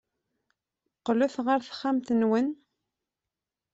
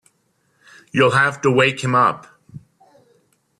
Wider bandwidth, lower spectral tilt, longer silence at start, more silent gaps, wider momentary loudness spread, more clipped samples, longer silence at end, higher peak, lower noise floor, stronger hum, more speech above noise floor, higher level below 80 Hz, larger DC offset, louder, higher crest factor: second, 8 kHz vs 12 kHz; about the same, -6 dB/octave vs -5 dB/octave; about the same, 1.05 s vs 0.95 s; neither; about the same, 8 LU vs 7 LU; neither; first, 1.2 s vs 1 s; second, -12 dBFS vs -2 dBFS; first, -89 dBFS vs -65 dBFS; neither; first, 63 dB vs 48 dB; second, -72 dBFS vs -60 dBFS; neither; second, -27 LUFS vs -17 LUFS; about the same, 18 dB vs 18 dB